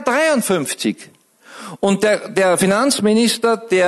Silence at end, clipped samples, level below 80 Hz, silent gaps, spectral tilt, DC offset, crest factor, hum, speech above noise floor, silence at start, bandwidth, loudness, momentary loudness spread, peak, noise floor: 0 s; under 0.1%; -60 dBFS; none; -4 dB/octave; under 0.1%; 16 dB; none; 23 dB; 0 s; 12.5 kHz; -16 LUFS; 8 LU; 0 dBFS; -39 dBFS